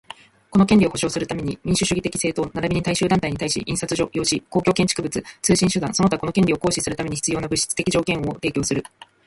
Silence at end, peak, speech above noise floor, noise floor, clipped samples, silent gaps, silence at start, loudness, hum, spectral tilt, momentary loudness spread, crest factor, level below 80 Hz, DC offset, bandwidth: 0.45 s; -4 dBFS; 22 dB; -43 dBFS; under 0.1%; none; 0.5 s; -21 LUFS; none; -4.5 dB/octave; 6 LU; 16 dB; -44 dBFS; under 0.1%; 11.5 kHz